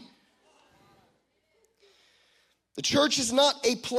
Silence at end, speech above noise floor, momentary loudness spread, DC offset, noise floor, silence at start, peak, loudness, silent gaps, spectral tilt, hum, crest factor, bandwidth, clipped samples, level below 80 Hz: 0 s; 46 dB; 8 LU; under 0.1%; -71 dBFS; 2.75 s; -10 dBFS; -24 LUFS; none; -2 dB/octave; none; 20 dB; 15.5 kHz; under 0.1%; -68 dBFS